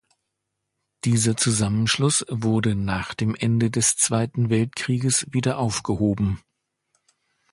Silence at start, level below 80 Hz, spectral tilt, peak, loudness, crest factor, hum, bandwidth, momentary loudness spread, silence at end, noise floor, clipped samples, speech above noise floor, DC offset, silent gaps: 1.05 s; -48 dBFS; -4.5 dB/octave; -6 dBFS; -22 LUFS; 16 dB; none; 11.5 kHz; 6 LU; 1.15 s; -80 dBFS; under 0.1%; 58 dB; under 0.1%; none